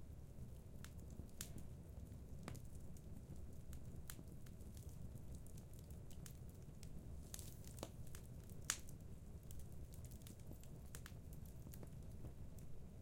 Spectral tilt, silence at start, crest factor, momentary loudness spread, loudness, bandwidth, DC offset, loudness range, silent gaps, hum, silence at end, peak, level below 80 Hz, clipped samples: -4 dB/octave; 0 s; 34 dB; 4 LU; -56 LUFS; 16.5 kHz; under 0.1%; 4 LU; none; none; 0 s; -20 dBFS; -60 dBFS; under 0.1%